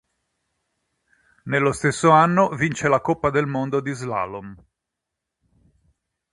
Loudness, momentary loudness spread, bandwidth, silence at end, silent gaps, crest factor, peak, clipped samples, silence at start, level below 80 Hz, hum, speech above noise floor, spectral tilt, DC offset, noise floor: -20 LUFS; 14 LU; 11.5 kHz; 1.75 s; none; 22 dB; -2 dBFS; under 0.1%; 1.45 s; -54 dBFS; none; 63 dB; -6 dB/octave; under 0.1%; -83 dBFS